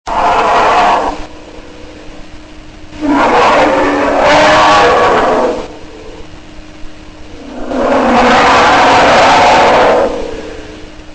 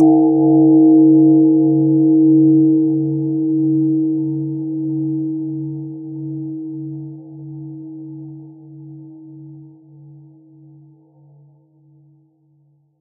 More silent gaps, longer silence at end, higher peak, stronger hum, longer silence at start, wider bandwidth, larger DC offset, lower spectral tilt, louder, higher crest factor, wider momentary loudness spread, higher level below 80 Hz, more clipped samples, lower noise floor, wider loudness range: neither; second, 0 s vs 3.35 s; about the same, -2 dBFS vs -2 dBFS; neither; about the same, 0.05 s vs 0 s; first, 9.6 kHz vs 0.9 kHz; neither; second, -4 dB/octave vs -7 dB/octave; first, -8 LUFS vs -14 LUFS; second, 8 dB vs 14 dB; second, 20 LU vs 23 LU; first, -32 dBFS vs -70 dBFS; neither; second, -30 dBFS vs -57 dBFS; second, 6 LU vs 23 LU